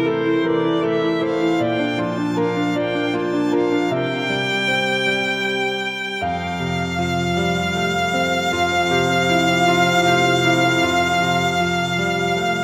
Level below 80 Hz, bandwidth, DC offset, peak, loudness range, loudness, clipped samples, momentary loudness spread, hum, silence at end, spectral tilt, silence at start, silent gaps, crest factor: -50 dBFS; 16 kHz; under 0.1%; -4 dBFS; 4 LU; -19 LUFS; under 0.1%; 6 LU; none; 0 s; -5 dB/octave; 0 s; none; 14 dB